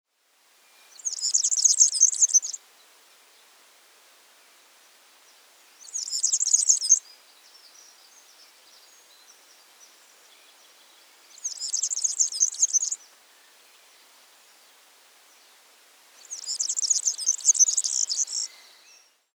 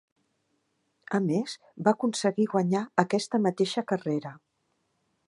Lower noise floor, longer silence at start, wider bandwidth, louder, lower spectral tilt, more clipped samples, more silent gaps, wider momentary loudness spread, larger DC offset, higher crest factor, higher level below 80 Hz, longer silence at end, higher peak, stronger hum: second, -64 dBFS vs -75 dBFS; about the same, 1.05 s vs 1.1 s; first, over 20 kHz vs 11.5 kHz; first, -21 LUFS vs -28 LUFS; second, 7 dB/octave vs -5.5 dB/octave; neither; neither; first, 17 LU vs 6 LU; neither; about the same, 24 dB vs 26 dB; second, under -90 dBFS vs -78 dBFS; about the same, 0.9 s vs 0.9 s; about the same, -6 dBFS vs -4 dBFS; neither